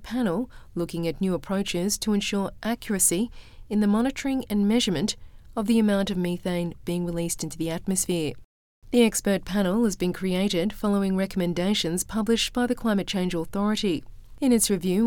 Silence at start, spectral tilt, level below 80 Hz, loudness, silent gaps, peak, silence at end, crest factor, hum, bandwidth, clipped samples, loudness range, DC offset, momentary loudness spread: 0 s; -4.5 dB/octave; -46 dBFS; -25 LUFS; 8.45-8.82 s; -8 dBFS; 0 s; 18 dB; none; 19 kHz; under 0.1%; 2 LU; under 0.1%; 8 LU